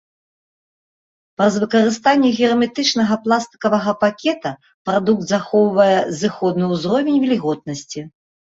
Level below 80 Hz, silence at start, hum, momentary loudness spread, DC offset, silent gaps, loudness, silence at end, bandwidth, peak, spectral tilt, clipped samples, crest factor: -60 dBFS; 1.4 s; none; 12 LU; under 0.1%; 4.74-4.85 s; -17 LUFS; 0.45 s; 8 kHz; -2 dBFS; -5 dB/octave; under 0.1%; 16 dB